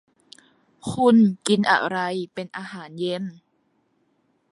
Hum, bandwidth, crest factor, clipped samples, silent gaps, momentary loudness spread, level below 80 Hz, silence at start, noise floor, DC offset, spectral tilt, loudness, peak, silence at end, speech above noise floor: none; 11.5 kHz; 20 dB; under 0.1%; none; 18 LU; -62 dBFS; 0.85 s; -68 dBFS; under 0.1%; -5.5 dB/octave; -22 LUFS; -4 dBFS; 1.2 s; 46 dB